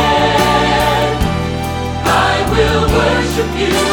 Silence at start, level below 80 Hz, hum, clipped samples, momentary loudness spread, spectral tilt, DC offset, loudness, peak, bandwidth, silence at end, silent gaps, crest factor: 0 s; -24 dBFS; none; under 0.1%; 6 LU; -4.5 dB/octave; under 0.1%; -13 LUFS; 0 dBFS; 19.5 kHz; 0 s; none; 12 dB